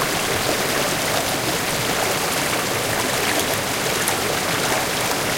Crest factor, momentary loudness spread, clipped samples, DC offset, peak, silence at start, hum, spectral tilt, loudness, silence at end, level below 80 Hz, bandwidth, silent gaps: 18 dB; 1 LU; under 0.1%; under 0.1%; -4 dBFS; 0 s; none; -2 dB/octave; -20 LUFS; 0 s; -46 dBFS; 16.5 kHz; none